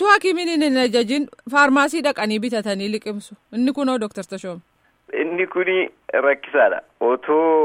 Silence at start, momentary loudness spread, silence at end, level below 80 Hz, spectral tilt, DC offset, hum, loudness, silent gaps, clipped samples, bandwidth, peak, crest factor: 0 s; 15 LU; 0 s; -68 dBFS; -4 dB/octave; under 0.1%; none; -20 LUFS; none; under 0.1%; 16 kHz; -2 dBFS; 18 dB